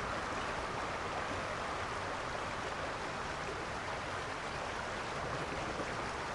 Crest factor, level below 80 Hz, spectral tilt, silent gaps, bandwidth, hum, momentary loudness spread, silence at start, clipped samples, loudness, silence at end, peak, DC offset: 14 dB; -54 dBFS; -4 dB/octave; none; 11.5 kHz; none; 2 LU; 0 s; under 0.1%; -39 LUFS; 0 s; -26 dBFS; under 0.1%